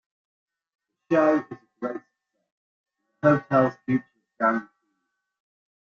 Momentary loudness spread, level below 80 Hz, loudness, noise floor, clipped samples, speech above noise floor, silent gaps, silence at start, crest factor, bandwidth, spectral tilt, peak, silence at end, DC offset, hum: 13 LU; -68 dBFS; -24 LUFS; -78 dBFS; under 0.1%; 56 dB; 2.52-2.84 s; 1.1 s; 20 dB; 7 kHz; -8.5 dB/octave; -6 dBFS; 1.2 s; under 0.1%; none